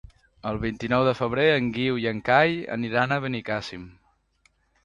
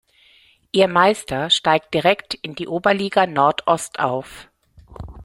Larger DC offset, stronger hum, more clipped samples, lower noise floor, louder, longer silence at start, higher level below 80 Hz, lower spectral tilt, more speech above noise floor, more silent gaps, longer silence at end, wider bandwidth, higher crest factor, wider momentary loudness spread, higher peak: neither; neither; neither; first, -66 dBFS vs -54 dBFS; second, -24 LUFS vs -19 LUFS; second, 0.45 s vs 0.75 s; about the same, -52 dBFS vs -50 dBFS; first, -6.5 dB/octave vs -4 dB/octave; first, 42 dB vs 36 dB; neither; first, 0.95 s vs 0 s; second, 10.5 kHz vs 16 kHz; about the same, 22 dB vs 18 dB; about the same, 11 LU vs 12 LU; about the same, -4 dBFS vs -2 dBFS